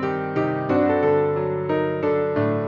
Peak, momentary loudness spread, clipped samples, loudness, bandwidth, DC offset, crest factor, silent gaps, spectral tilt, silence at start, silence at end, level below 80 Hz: -8 dBFS; 5 LU; under 0.1%; -22 LUFS; 5.6 kHz; under 0.1%; 14 dB; none; -9.5 dB/octave; 0 s; 0 s; -58 dBFS